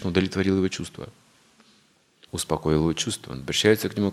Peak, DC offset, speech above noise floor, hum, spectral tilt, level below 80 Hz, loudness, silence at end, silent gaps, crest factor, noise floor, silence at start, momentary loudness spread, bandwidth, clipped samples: -4 dBFS; under 0.1%; 37 dB; none; -4.5 dB/octave; -50 dBFS; -24 LUFS; 0 s; none; 22 dB; -61 dBFS; 0 s; 15 LU; 15 kHz; under 0.1%